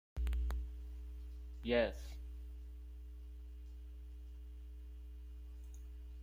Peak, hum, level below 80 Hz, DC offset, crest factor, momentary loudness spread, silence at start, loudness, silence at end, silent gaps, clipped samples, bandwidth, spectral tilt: -20 dBFS; none; -46 dBFS; under 0.1%; 24 dB; 17 LU; 0.15 s; -45 LUFS; 0 s; none; under 0.1%; 16 kHz; -7 dB/octave